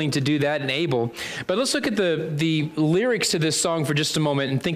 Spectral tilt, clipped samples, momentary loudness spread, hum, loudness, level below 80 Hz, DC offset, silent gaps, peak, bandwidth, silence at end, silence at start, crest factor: -4.5 dB/octave; under 0.1%; 3 LU; none; -22 LUFS; -60 dBFS; under 0.1%; none; -12 dBFS; 15.5 kHz; 0 s; 0 s; 12 dB